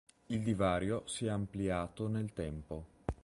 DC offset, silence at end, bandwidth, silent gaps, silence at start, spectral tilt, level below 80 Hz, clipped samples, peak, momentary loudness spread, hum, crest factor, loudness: under 0.1%; 0.1 s; 11.5 kHz; none; 0.3 s; -6 dB/octave; -52 dBFS; under 0.1%; -18 dBFS; 11 LU; none; 20 dB; -37 LUFS